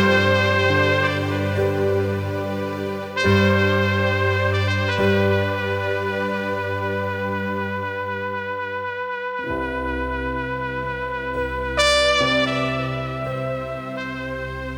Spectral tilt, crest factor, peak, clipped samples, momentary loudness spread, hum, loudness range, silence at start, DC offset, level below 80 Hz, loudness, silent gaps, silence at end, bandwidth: -5.5 dB/octave; 20 dB; -2 dBFS; under 0.1%; 10 LU; none; 6 LU; 0 s; under 0.1%; -42 dBFS; -22 LUFS; none; 0 s; 16 kHz